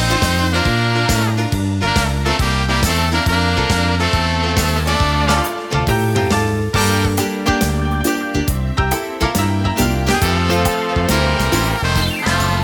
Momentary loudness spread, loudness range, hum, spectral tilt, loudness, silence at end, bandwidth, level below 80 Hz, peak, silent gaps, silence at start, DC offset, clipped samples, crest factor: 3 LU; 1 LU; none; -4.5 dB/octave; -17 LUFS; 0 s; 19.5 kHz; -26 dBFS; 0 dBFS; none; 0 s; under 0.1%; under 0.1%; 16 dB